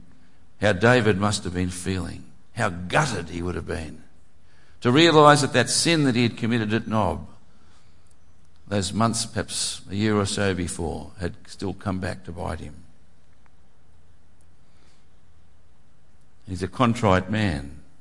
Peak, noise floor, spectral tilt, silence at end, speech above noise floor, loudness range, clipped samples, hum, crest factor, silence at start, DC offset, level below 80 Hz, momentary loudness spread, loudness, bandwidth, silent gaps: -2 dBFS; -59 dBFS; -4.5 dB/octave; 0.2 s; 37 dB; 15 LU; under 0.1%; none; 22 dB; 0.6 s; 1%; -50 dBFS; 16 LU; -23 LUFS; 11.5 kHz; none